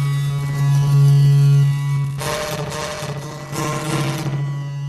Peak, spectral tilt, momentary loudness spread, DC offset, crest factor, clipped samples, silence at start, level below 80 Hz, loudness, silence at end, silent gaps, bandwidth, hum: -6 dBFS; -6.5 dB/octave; 12 LU; under 0.1%; 12 dB; under 0.1%; 0 s; -46 dBFS; -18 LUFS; 0 s; none; 13 kHz; none